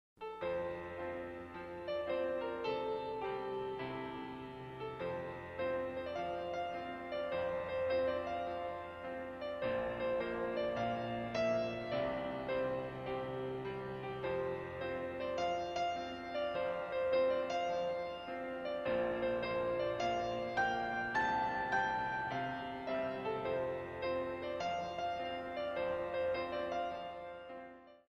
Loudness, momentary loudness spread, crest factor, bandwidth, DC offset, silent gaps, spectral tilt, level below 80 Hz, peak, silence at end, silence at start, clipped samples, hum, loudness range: -39 LUFS; 8 LU; 16 dB; 7 kHz; under 0.1%; none; -5.5 dB/octave; -64 dBFS; -22 dBFS; 0.1 s; 0.2 s; under 0.1%; none; 4 LU